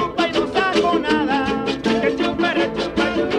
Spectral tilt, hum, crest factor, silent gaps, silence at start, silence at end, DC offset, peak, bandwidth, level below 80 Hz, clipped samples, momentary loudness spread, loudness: -5 dB/octave; none; 14 dB; none; 0 s; 0 s; under 0.1%; -6 dBFS; 11.5 kHz; -44 dBFS; under 0.1%; 3 LU; -19 LUFS